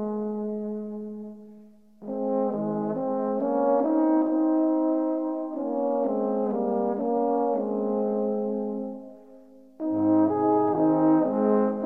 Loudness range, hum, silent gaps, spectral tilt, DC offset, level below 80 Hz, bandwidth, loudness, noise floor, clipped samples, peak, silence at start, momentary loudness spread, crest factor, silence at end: 4 LU; none; none; -11.5 dB/octave; 0.1%; -70 dBFS; 2.5 kHz; -25 LUFS; -51 dBFS; under 0.1%; -10 dBFS; 0 s; 12 LU; 16 dB; 0 s